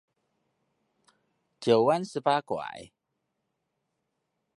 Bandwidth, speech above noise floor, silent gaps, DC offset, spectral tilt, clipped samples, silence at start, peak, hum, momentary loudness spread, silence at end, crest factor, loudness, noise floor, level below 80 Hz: 11.5 kHz; 55 dB; none; under 0.1%; -5.5 dB/octave; under 0.1%; 1.6 s; -8 dBFS; none; 16 LU; 1.7 s; 24 dB; -27 LUFS; -81 dBFS; -76 dBFS